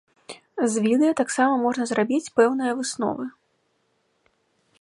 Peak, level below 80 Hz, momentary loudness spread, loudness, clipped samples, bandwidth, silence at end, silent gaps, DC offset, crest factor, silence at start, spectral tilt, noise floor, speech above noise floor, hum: -4 dBFS; -70 dBFS; 16 LU; -23 LUFS; under 0.1%; 11.5 kHz; 1.5 s; none; under 0.1%; 20 dB; 0.3 s; -4.5 dB/octave; -70 dBFS; 48 dB; none